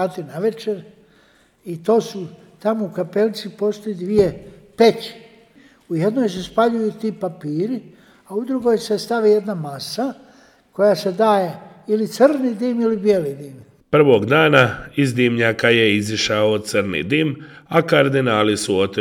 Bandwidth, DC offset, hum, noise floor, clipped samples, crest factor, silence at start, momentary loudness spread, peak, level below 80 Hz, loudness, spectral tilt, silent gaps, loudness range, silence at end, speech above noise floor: 16.5 kHz; under 0.1%; none; -55 dBFS; under 0.1%; 18 dB; 0 s; 12 LU; 0 dBFS; -56 dBFS; -18 LUFS; -5.5 dB/octave; none; 6 LU; 0 s; 37 dB